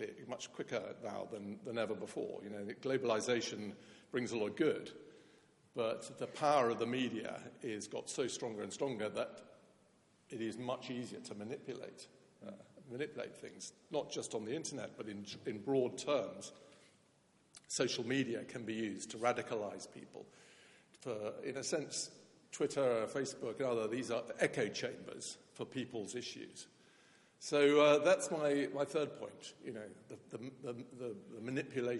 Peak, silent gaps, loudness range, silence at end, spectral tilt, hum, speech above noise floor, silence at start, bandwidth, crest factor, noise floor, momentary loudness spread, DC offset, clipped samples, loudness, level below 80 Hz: -18 dBFS; none; 11 LU; 0 s; -4 dB/octave; none; 32 dB; 0 s; 11.5 kHz; 22 dB; -72 dBFS; 16 LU; under 0.1%; under 0.1%; -39 LUFS; -86 dBFS